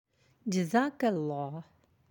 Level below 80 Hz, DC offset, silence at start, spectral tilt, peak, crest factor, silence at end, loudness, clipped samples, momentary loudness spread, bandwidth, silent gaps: -80 dBFS; under 0.1%; 0.45 s; -6 dB/octave; -14 dBFS; 20 dB; 0.5 s; -32 LUFS; under 0.1%; 13 LU; 17 kHz; none